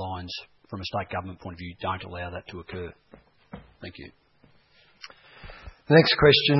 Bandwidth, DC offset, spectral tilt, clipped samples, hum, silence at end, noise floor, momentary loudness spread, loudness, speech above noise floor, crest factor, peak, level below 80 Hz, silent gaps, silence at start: 6 kHz; under 0.1%; -7 dB/octave; under 0.1%; none; 0 s; -60 dBFS; 28 LU; -24 LUFS; 35 dB; 22 dB; -4 dBFS; -52 dBFS; none; 0 s